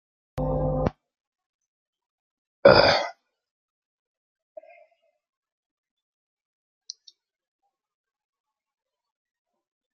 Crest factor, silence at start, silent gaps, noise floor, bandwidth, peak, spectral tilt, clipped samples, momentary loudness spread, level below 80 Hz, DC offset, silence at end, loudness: 28 dB; 0.35 s; 1.27-1.33 s, 1.46-1.59 s, 1.68-1.93 s, 2.10-2.63 s; -63 dBFS; 7 kHz; -2 dBFS; -5.5 dB/octave; under 0.1%; 27 LU; -46 dBFS; under 0.1%; 6.85 s; -21 LUFS